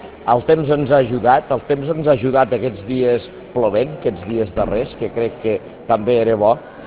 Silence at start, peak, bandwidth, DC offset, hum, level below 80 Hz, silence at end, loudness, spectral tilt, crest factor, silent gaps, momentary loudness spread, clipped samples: 0 s; 0 dBFS; 4 kHz; under 0.1%; none; -42 dBFS; 0 s; -18 LUFS; -11 dB/octave; 16 dB; none; 7 LU; under 0.1%